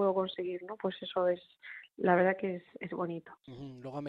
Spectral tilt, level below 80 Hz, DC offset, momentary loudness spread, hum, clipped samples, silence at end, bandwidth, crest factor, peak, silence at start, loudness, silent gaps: -8.5 dB/octave; -76 dBFS; under 0.1%; 20 LU; none; under 0.1%; 0 s; 5.4 kHz; 20 dB; -14 dBFS; 0 s; -33 LUFS; none